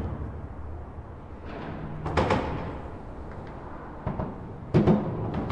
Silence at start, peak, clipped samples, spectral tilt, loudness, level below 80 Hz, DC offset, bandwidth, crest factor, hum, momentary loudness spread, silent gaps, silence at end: 0 s; -8 dBFS; under 0.1%; -8.5 dB/octave; -30 LUFS; -42 dBFS; under 0.1%; 9.4 kHz; 22 dB; none; 17 LU; none; 0 s